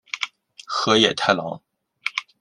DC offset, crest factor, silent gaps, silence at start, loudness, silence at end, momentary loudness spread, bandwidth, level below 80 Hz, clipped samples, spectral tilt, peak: under 0.1%; 22 dB; none; 0.15 s; -21 LUFS; 0.2 s; 14 LU; 11.5 kHz; -62 dBFS; under 0.1%; -3 dB/octave; -2 dBFS